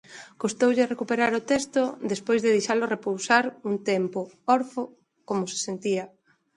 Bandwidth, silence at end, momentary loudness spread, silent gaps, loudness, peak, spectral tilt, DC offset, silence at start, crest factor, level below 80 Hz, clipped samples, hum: 11.5 kHz; 0.5 s; 9 LU; none; -25 LUFS; -6 dBFS; -4 dB/octave; under 0.1%; 0.1 s; 20 dB; -70 dBFS; under 0.1%; none